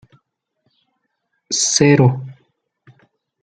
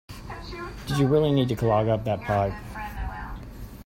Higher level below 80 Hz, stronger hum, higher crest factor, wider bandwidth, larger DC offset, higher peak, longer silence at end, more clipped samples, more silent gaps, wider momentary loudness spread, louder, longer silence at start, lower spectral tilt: second, -58 dBFS vs -40 dBFS; neither; about the same, 18 dB vs 16 dB; second, 9.4 kHz vs 16.5 kHz; neither; first, -2 dBFS vs -10 dBFS; first, 1.1 s vs 0.05 s; neither; neither; about the same, 17 LU vs 18 LU; first, -15 LUFS vs -25 LUFS; first, 1.5 s vs 0.1 s; second, -4.5 dB/octave vs -7.5 dB/octave